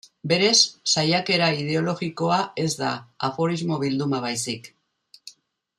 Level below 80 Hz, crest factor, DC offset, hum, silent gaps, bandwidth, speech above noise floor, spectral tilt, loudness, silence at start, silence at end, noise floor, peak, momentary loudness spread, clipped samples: -66 dBFS; 20 dB; under 0.1%; none; none; 13.5 kHz; 33 dB; -3.5 dB/octave; -22 LUFS; 0.25 s; 0.5 s; -56 dBFS; -4 dBFS; 11 LU; under 0.1%